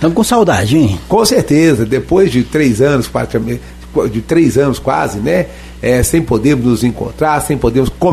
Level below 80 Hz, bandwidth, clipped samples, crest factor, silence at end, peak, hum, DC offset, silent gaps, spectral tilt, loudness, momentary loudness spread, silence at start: -30 dBFS; 13.5 kHz; under 0.1%; 12 dB; 0 s; 0 dBFS; none; under 0.1%; none; -5.5 dB/octave; -12 LUFS; 7 LU; 0 s